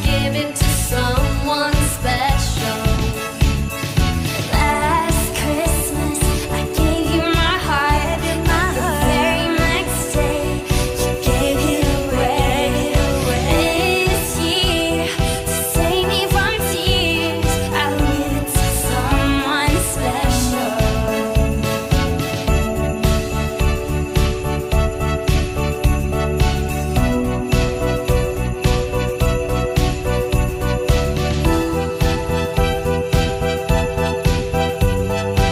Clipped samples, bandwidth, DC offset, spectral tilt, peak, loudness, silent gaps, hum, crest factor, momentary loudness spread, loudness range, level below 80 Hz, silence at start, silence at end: under 0.1%; 16 kHz; under 0.1%; -4.5 dB/octave; -2 dBFS; -18 LUFS; none; none; 14 dB; 4 LU; 2 LU; -24 dBFS; 0 s; 0 s